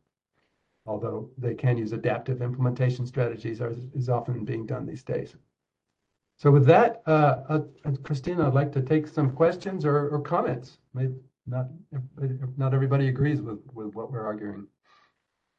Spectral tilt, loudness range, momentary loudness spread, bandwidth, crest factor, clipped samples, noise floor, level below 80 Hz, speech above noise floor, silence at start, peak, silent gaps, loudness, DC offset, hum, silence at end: -9.5 dB/octave; 6 LU; 15 LU; 7 kHz; 20 dB; under 0.1%; -83 dBFS; -60 dBFS; 57 dB; 0.85 s; -6 dBFS; none; -26 LUFS; under 0.1%; none; 0.95 s